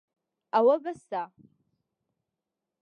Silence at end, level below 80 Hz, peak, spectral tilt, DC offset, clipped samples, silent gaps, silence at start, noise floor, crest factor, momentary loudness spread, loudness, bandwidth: 1.55 s; -82 dBFS; -12 dBFS; -6 dB/octave; under 0.1%; under 0.1%; none; 0.55 s; -87 dBFS; 20 dB; 13 LU; -27 LUFS; 9.6 kHz